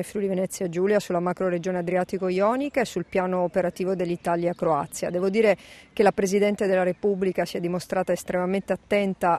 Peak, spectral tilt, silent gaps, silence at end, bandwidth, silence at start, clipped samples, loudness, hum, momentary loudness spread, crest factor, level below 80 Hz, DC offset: -6 dBFS; -6 dB/octave; none; 0 s; 13.5 kHz; 0 s; under 0.1%; -25 LUFS; none; 5 LU; 18 dB; -58 dBFS; under 0.1%